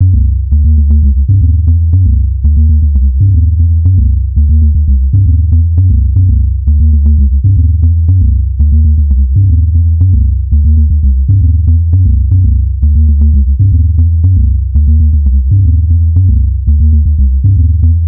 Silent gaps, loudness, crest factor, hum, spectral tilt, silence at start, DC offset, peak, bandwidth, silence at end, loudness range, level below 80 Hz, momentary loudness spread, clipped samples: none; -9 LUFS; 6 dB; none; -17.5 dB/octave; 0 s; under 0.1%; 0 dBFS; 0.5 kHz; 0 s; 0 LU; -8 dBFS; 2 LU; 0.3%